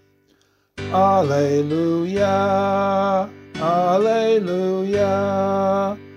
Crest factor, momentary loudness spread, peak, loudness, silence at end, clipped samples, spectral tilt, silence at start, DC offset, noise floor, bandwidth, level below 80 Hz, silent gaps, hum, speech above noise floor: 14 dB; 5 LU; -6 dBFS; -19 LUFS; 0 s; under 0.1%; -7 dB/octave; 0.75 s; under 0.1%; -61 dBFS; 12.5 kHz; -56 dBFS; none; none; 42 dB